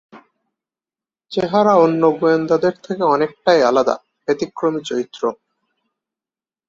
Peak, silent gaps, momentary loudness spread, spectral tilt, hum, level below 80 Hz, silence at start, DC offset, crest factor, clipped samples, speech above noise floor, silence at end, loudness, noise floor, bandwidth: -2 dBFS; none; 11 LU; -6 dB/octave; none; -62 dBFS; 0.15 s; under 0.1%; 18 dB; under 0.1%; over 74 dB; 1.35 s; -17 LUFS; under -90 dBFS; 7.6 kHz